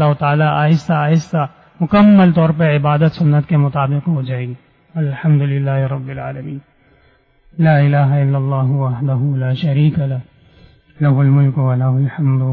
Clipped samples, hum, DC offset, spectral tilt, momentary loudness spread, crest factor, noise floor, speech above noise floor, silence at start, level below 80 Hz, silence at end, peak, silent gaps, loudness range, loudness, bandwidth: under 0.1%; none; under 0.1%; -9.5 dB/octave; 13 LU; 10 dB; -53 dBFS; 40 dB; 0 s; -48 dBFS; 0 s; -4 dBFS; none; 6 LU; -15 LUFS; 6.2 kHz